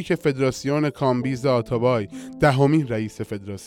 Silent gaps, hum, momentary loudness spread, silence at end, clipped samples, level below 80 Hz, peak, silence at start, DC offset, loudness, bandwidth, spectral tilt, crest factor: none; none; 11 LU; 0 s; under 0.1%; -50 dBFS; -6 dBFS; 0 s; under 0.1%; -22 LUFS; 15.5 kHz; -7 dB/octave; 16 dB